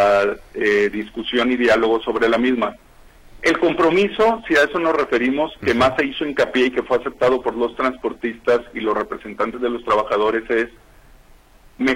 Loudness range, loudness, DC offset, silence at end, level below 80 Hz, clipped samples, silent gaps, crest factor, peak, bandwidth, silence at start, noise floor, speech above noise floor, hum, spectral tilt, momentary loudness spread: 4 LU; -19 LUFS; under 0.1%; 0 s; -48 dBFS; under 0.1%; none; 14 dB; -4 dBFS; 15.5 kHz; 0 s; -48 dBFS; 29 dB; none; -5 dB/octave; 7 LU